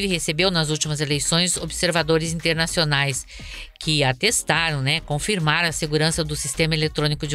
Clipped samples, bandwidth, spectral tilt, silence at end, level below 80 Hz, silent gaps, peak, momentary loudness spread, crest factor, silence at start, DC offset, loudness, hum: under 0.1%; 16 kHz; -3.5 dB/octave; 0 s; -40 dBFS; none; -4 dBFS; 5 LU; 18 dB; 0 s; under 0.1%; -21 LUFS; none